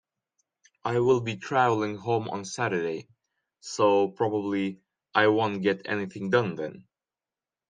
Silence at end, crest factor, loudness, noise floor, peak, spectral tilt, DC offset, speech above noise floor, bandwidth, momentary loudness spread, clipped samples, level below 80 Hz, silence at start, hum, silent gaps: 0.9 s; 22 dB; -27 LUFS; under -90 dBFS; -6 dBFS; -5.5 dB/octave; under 0.1%; over 64 dB; 9.6 kHz; 12 LU; under 0.1%; -70 dBFS; 0.85 s; none; none